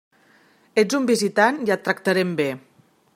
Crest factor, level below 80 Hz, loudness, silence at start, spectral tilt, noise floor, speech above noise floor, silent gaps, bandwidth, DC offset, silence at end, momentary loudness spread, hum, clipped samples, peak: 20 dB; -72 dBFS; -21 LUFS; 0.75 s; -4.5 dB/octave; -57 dBFS; 37 dB; none; 16 kHz; under 0.1%; 0.55 s; 7 LU; none; under 0.1%; -2 dBFS